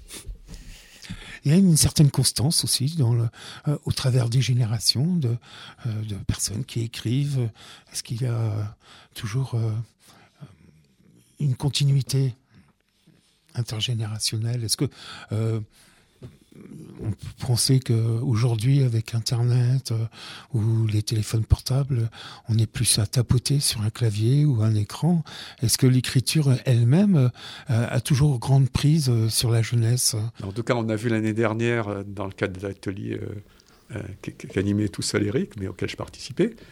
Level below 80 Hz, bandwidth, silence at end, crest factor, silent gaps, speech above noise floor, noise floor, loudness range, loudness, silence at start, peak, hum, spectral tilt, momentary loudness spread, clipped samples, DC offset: -46 dBFS; 16.5 kHz; 0.05 s; 20 dB; none; 37 dB; -60 dBFS; 8 LU; -23 LUFS; 0 s; -4 dBFS; none; -5 dB/octave; 14 LU; under 0.1%; under 0.1%